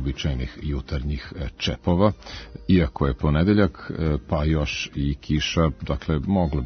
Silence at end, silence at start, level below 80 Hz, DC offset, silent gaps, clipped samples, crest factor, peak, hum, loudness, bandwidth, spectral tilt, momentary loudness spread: 0 s; 0 s; -34 dBFS; under 0.1%; none; under 0.1%; 18 dB; -4 dBFS; none; -24 LUFS; 6.6 kHz; -6.5 dB/octave; 10 LU